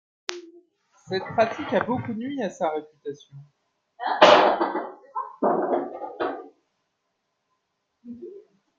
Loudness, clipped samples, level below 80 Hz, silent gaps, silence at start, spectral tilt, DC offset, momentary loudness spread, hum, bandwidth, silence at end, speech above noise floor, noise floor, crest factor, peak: -24 LUFS; under 0.1%; -70 dBFS; none; 0.3 s; -4.5 dB/octave; under 0.1%; 24 LU; none; 7.6 kHz; 0.4 s; 49 dB; -77 dBFS; 26 dB; 0 dBFS